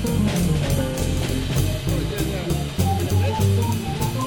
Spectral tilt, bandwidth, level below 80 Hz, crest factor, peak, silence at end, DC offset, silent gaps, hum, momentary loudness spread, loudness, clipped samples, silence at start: -6 dB/octave; 19 kHz; -32 dBFS; 14 dB; -6 dBFS; 0 s; under 0.1%; none; none; 4 LU; -22 LUFS; under 0.1%; 0 s